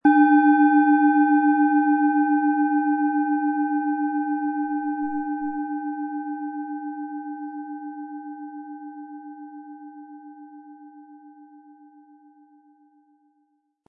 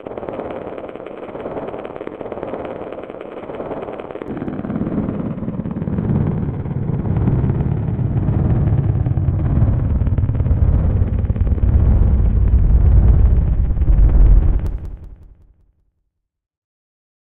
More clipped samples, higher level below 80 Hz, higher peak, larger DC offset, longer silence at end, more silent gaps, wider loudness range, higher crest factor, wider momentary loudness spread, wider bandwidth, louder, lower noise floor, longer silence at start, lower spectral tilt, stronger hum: neither; second, -72 dBFS vs -20 dBFS; second, -6 dBFS vs 0 dBFS; neither; first, 2.45 s vs 2 s; neither; first, 23 LU vs 12 LU; about the same, 18 dB vs 16 dB; first, 23 LU vs 15 LU; about the same, 3.7 kHz vs 3.4 kHz; second, -22 LUFS vs -19 LUFS; about the same, -69 dBFS vs -72 dBFS; about the same, 0.05 s vs 0 s; second, -8.5 dB/octave vs -12 dB/octave; neither